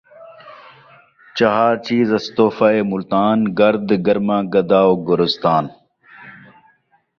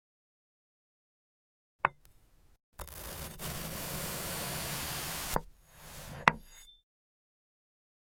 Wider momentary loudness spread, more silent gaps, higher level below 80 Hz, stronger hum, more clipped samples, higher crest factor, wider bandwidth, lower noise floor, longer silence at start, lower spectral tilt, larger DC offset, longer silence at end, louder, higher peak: second, 4 LU vs 20 LU; second, none vs 2.63-2.72 s; about the same, -58 dBFS vs -54 dBFS; neither; neither; second, 16 dB vs 36 dB; second, 6.8 kHz vs 17 kHz; about the same, -59 dBFS vs -62 dBFS; second, 0.2 s vs 1.85 s; first, -7 dB/octave vs -2.5 dB/octave; neither; second, 0.9 s vs 1.3 s; first, -16 LUFS vs -35 LUFS; about the same, -2 dBFS vs -4 dBFS